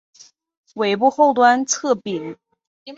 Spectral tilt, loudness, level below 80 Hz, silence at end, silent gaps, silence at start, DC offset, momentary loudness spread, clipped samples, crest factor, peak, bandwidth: -3 dB/octave; -18 LUFS; -70 dBFS; 0 s; 2.67-2.86 s; 0.75 s; under 0.1%; 16 LU; under 0.1%; 18 dB; -2 dBFS; 8 kHz